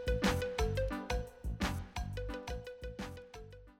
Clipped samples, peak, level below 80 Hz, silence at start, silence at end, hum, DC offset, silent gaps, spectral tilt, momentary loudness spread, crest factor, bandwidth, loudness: under 0.1%; -18 dBFS; -42 dBFS; 0 s; 0.1 s; none; under 0.1%; none; -5.5 dB/octave; 13 LU; 18 dB; 16.5 kHz; -39 LUFS